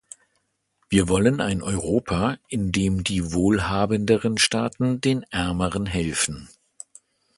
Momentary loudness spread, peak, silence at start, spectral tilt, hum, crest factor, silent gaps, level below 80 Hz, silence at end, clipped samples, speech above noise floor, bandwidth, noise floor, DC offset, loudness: 6 LU; -2 dBFS; 0.9 s; -4.5 dB/octave; none; 22 dB; none; -42 dBFS; 0.9 s; under 0.1%; 49 dB; 11.5 kHz; -72 dBFS; under 0.1%; -23 LUFS